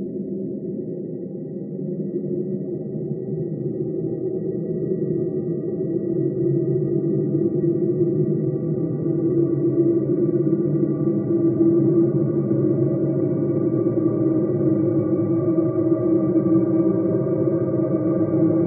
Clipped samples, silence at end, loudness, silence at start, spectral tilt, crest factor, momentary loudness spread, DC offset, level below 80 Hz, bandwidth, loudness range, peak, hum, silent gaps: under 0.1%; 0 s; -22 LUFS; 0 s; -16.5 dB/octave; 14 dB; 9 LU; under 0.1%; -58 dBFS; 2.4 kHz; 7 LU; -8 dBFS; none; none